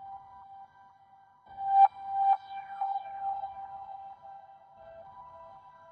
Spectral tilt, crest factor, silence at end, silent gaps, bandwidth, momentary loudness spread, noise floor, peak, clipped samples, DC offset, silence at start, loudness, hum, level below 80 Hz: -4.5 dB/octave; 22 dB; 0.2 s; none; 4.7 kHz; 27 LU; -60 dBFS; -12 dBFS; under 0.1%; under 0.1%; 0 s; -29 LUFS; none; -76 dBFS